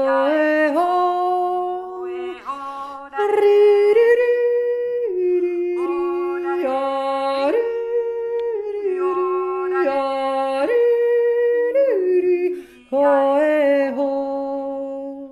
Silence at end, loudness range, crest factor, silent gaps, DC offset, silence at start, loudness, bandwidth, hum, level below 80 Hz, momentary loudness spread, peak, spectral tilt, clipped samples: 0 s; 4 LU; 14 dB; none; under 0.1%; 0 s; -19 LUFS; 11.5 kHz; none; -64 dBFS; 13 LU; -6 dBFS; -4.5 dB/octave; under 0.1%